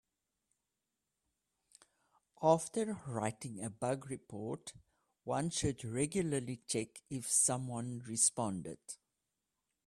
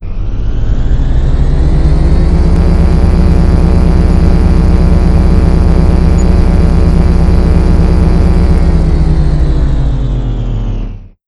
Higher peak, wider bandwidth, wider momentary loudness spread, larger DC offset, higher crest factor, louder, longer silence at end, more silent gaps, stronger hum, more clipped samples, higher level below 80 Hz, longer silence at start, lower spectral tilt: second, -16 dBFS vs 0 dBFS; first, 15 kHz vs 10.5 kHz; first, 15 LU vs 7 LU; neither; first, 24 dB vs 8 dB; second, -36 LUFS vs -10 LUFS; first, 0.9 s vs 0.2 s; neither; neither; second, under 0.1% vs 2%; second, -68 dBFS vs -8 dBFS; first, 2.4 s vs 0 s; second, -4 dB/octave vs -8.5 dB/octave